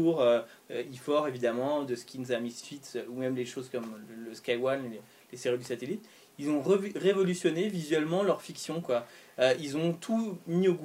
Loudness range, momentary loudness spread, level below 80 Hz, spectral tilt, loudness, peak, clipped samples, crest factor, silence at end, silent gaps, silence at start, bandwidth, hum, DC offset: 6 LU; 12 LU; -78 dBFS; -5.5 dB/octave; -31 LUFS; -12 dBFS; under 0.1%; 18 dB; 0 s; none; 0 s; 16 kHz; none; under 0.1%